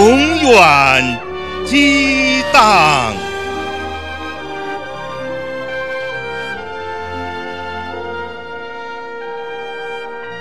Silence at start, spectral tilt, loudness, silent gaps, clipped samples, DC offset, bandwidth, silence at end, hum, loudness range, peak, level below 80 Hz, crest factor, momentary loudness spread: 0 s; -3.5 dB/octave; -14 LUFS; none; under 0.1%; 1%; 16 kHz; 0 s; none; 15 LU; 0 dBFS; -40 dBFS; 16 dB; 17 LU